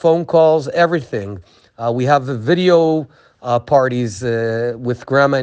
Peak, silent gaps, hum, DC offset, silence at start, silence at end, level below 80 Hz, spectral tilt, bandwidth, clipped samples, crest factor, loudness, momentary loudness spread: 0 dBFS; none; none; under 0.1%; 0.05 s; 0 s; -56 dBFS; -6.5 dB/octave; 9.2 kHz; under 0.1%; 16 dB; -16 LUFS; 13 LU